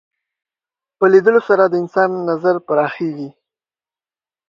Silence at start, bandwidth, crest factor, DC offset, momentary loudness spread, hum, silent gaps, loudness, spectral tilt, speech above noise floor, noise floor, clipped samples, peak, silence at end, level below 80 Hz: 1 s; 6.8 kHz; 18 dB; under 0.1%; 12 LU; none; none; -15 LUFS; -8 dB/octave; over 75 dB; under -90 dBFS; under 0.1%; 0 dBFS; 1.2 s; -68 dBFS